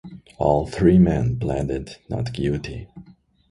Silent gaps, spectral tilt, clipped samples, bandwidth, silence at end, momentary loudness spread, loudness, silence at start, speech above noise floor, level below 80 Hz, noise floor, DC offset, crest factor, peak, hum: none; -8.5 dB/octave; under 0.1%; 11 kHz; 0.5 s; 15 LU; -21 LUFS; 0.05 s; 29 dB; -38 dBFS; -50 dBFS; under 0.1%; 18 dB; -4 dBFS; none